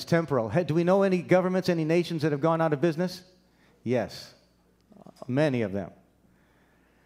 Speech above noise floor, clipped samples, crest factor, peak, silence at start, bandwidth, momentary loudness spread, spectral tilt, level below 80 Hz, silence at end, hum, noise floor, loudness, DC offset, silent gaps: 38 dB; under 0.1%; 20 dB; -8 dBFS; 0 s; 15.5 kHz; 14 LU; -7 dB/octave; -66 dBFS; 1.15 s; none; -64 dBFS; -26 LUFS; under 0.1%; none